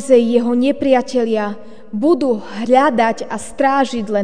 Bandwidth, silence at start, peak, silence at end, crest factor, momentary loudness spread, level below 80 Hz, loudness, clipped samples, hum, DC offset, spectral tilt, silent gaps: 10 kHz; 0 s; 0 dBFS; 0 s; 16 dB; 12 LU; -54 dBFS; -16 LUFS; under 0.1%; none; 2%; -5 dB/octave; none